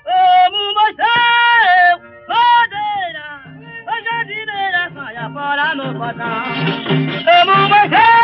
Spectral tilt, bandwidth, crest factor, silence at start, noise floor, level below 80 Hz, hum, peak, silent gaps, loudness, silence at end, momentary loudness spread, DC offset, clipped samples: -1 dB/octave; 6 kHz; 12 dB; 0.05 s; -34 dBFS; -58 dBFS; none; -2 dBFS; none; -13 LUFS; 0 s; 14 LU; under 0.1%; under 0.1%